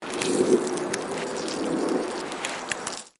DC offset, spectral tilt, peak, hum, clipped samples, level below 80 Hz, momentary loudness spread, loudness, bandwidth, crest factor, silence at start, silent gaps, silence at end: under 0.1%; -3.5 dB/octave; -8 dBFS; none; under 0.1%; -64 dBFS; 8 LU; -27 LUFS; 11.5 kHz; 20 dB; 0 s; none; 0.1 s